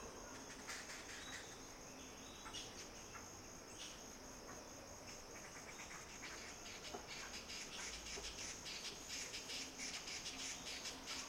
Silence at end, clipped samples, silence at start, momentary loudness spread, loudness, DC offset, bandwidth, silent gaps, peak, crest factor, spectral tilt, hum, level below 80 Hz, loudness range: 0 s; under 0.1%; 0 s; 8 LU; -50 LUFS; under 0.1%; 16.5 kHz; none; -34 dBFS; 18 dB; -1 dB/octave; none; -66 dBFS; 6 LU